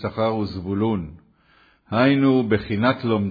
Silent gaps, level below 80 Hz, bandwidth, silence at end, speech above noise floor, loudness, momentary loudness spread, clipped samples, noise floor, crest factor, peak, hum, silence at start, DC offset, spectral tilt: none; -50 dBFS; 5 kHz; 0 s; 37 dB; -21 LUFS; 9 LU; under 0.1%; -57 dBFS; 16 dB; -4 dBFS; none; 0 s; under 0.1%; -9.5 dB/octave